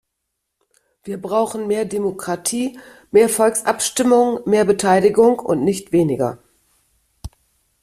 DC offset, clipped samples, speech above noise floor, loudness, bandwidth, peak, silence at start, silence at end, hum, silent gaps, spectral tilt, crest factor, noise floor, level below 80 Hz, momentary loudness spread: under 0.1%; under 0.1%; 60 dB; -17 LUFS; 15 kHz; -2 dBFS; 1.05 s; 0.55 s; none; none; -4.5 dB/octave; 18 dB; -77 dBFS; -50 dBFS; 9 LU